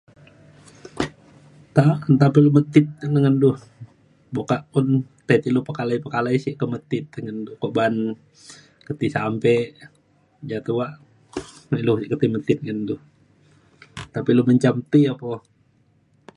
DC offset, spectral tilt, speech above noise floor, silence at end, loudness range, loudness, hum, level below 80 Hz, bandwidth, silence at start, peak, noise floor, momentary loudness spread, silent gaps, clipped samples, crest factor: under 0.1%; -8 dB/octave; 41 dB; 1 s; 7 LU; -21 LUFS; none; -58 dBFS; 11 kHz; 0.95 s; -2 dBFS; -61 dBFS; 16 LU; none; under 0.1%; 20 dB